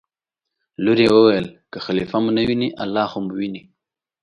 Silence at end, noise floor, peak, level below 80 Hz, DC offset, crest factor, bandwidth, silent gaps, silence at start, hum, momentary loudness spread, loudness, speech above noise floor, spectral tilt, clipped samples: 0.65 s; -84 dBFS; -2 dBFS; -54 dBFS; under 0.1%; 18 dB; 10.5 kHz; none; 0.8 s; none; 15 LU; -19 LUFS; 66 dB; -7 dB/octave; under 0.1%